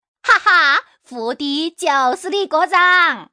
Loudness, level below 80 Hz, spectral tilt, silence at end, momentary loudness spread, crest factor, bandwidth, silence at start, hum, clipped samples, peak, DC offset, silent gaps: -14 LUFS; -64 dBFS; -1 dB/octave; 0.1 s; 12 LU; 14 dB; 10.5 kHz; 0.25 s; none; under 0.1%; -2 dBFS; under 0.1%; none